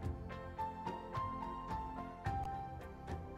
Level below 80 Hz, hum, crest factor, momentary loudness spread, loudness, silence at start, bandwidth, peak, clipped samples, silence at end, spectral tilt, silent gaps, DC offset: -52 dBFS; none; 16 dB; 6 LU; -44 LUFS; 0 s; 15 kHz; -28 dBFS; under 0.1%; 0 s; -7.5 dB/octave; none; under 0.1%